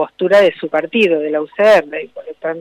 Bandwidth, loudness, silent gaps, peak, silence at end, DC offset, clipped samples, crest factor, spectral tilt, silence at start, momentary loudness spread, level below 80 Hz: 11.5 kHz; -14 LUFS; none; -4 dBFS; 0 s; under 0.1%; under 0.1%; 10 dB; -5 dB/octave; 0 s; 15 LU; -60 dBFS